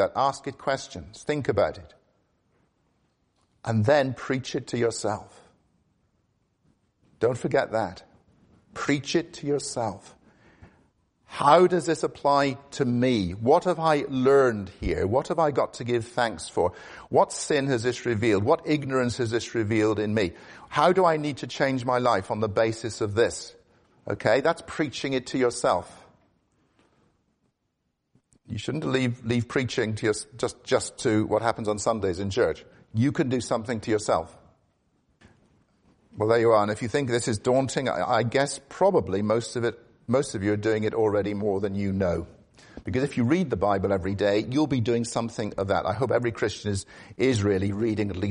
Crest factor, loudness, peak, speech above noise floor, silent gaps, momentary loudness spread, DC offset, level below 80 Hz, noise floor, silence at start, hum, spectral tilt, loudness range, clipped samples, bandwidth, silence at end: 22 dB; -25 LUFS; -4 dBFS; 52 dB; none; 9 LU; under 0.1%; -54 dBFS; -77 dBFS; 0 s; none; -5.5 dB/octave; 7 LU; under 0.1%; 10.5 kHz; 0 s